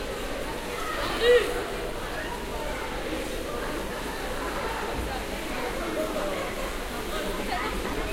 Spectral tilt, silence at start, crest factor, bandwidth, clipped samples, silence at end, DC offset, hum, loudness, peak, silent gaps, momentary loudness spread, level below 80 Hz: -4 dB/octave; 0 s; 20 dB; 16 kHz; under 0.1%; 0 s; under 0.1%; none; -30 LUFS; -10 dBFS; none; 8 LU; -38 dBFS